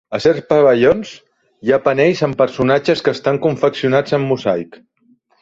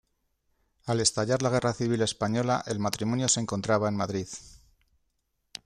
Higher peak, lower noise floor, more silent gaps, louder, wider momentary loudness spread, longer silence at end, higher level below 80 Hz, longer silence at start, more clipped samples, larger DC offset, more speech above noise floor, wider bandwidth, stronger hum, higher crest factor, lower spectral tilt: first, -2 dBFS vs -8 dBFS; second, -56 dBFS vs -76 dBFS; neither; first, -15 LUFS vs -27 LUFS; about the same, 8 LU vs 10 LU; second, 0.8 s vs 1.1 s; first, -50 dBFS vs -60 dBFS; second, 0.1 s vs 0.85 s; neither; neither; second, 41 dB vs 49 dB; second, 7.8 kHz vs 14.5 kHz; neither; second, 14 dB vs 22 dB; first, -6.5 dB/octave vs -4.5 dB/octave